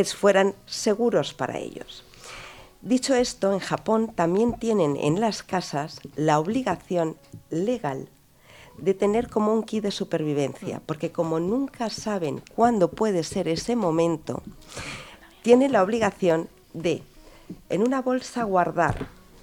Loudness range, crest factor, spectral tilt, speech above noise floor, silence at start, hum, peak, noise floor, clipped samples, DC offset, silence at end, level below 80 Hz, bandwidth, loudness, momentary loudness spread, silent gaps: 3 LU; 20 dB; -5.5 dB/octave; 27 dB; 0 s; none; -4 dBFS; -52 dBFS; under 0.1%; under 0.1%; 0.3 s; -54 dBFS; 19 kHz; -25 LUFS; 16 LU; none